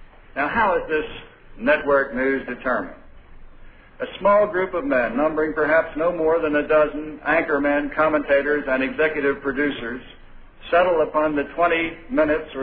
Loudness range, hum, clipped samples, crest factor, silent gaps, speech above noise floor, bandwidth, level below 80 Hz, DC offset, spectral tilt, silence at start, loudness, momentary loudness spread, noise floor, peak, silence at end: 3 LU; none; under 0.1%; 16 dB; none; 23 dB; 4.8 kHz; -44 dBFS; under 0.1%; -9 dB/octave; 0 s; -21 LUFS; 8 LU; -43 dBFS; -6 dBFS; 0 s